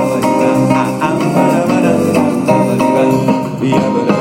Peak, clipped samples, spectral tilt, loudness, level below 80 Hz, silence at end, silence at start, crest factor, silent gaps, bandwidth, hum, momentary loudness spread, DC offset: 0 dBFS; under 0.1%; -6.5 dB/octave; -12 LUFS; -46 dBFS; 0 s; 0 s; 12 dB; none; 16.5 kHz; none; 3 LU; under 0.1%